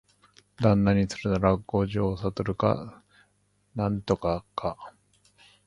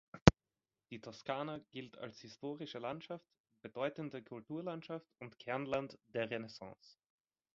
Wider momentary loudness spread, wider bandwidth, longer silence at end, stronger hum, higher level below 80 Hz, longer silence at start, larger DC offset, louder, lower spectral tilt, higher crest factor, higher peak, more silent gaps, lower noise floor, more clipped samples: about the same, 12 LU vs 12 LU; first, 11 kHz vs 7.4 kHz; about the same, 0.8 s vs 0.8 s; first, 50 Hz at -45 dBFS vs none; first, -46 dBFS vs -54 dBFS; first, 0.6 s vs 0.15 s; neither; first, -27 LUFS vs -41 LUFS; first, -7.5 dB/octave vs -5.5 dB/octave; second, 22 dB vs 38 dB; second, -6 dBFS vs -2 dBFS; second, none vs 0.22-0.26 s, 3.40-3.44 s; second, -69 dBFS vs under -90 dBFS; neither